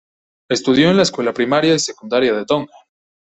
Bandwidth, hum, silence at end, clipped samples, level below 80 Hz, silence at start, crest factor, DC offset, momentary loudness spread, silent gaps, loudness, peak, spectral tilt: 8.4 kHz; none; 0.6 s; under 0.1%; -54 dBFS; 0.5 s; 16 dB; under 0.1%; 8 LU; none; -16 LUFS; -2 dBFS; -4.5 dB/octave